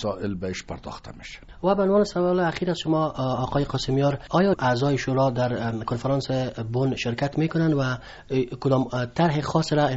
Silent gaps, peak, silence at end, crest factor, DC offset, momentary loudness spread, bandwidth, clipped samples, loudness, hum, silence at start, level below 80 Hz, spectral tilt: none; -8 dBFS; 0 s; 16 dB; under 0.1%; 10 LU; 8 kHz; under 0.1%; -24 LUFS; none; 0 s; -48 dBFS; -6 dB/octave